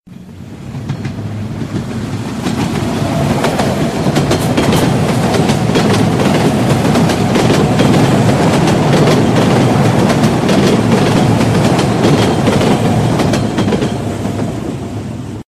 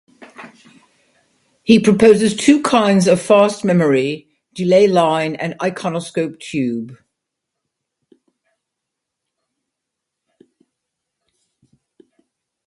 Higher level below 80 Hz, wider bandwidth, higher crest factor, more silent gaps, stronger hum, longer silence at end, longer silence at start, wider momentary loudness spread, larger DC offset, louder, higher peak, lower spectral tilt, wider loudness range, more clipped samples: first, -34 dBFS vs -58 dBFS; first, 15.5 kHz vs 11.5 kHz; second, 12 dB vs 18 dB; neither; neither; second, 0.1 s vs 5.75 s; second, 0.05 s vs 0.4 s; about the same, 11 LU vs 12 LU; neither; first, -12 LUFS vs -15 LUFS; about the same, 0 dBFS vs 0 dBFS; about the same, -6 dB/octave vs -5.5 dB/octave; second, 5 LU vs 14 LU; neither